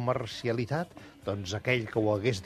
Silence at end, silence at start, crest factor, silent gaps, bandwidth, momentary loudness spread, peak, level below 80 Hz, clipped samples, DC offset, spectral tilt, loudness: 0 s; 0 s; 20 dB; none; 13.5 kHz; 9 LU; -10 dBFS; -60 dBFS; under 0.1%; under 0.1%; -6 dB/octave; -31 LUFS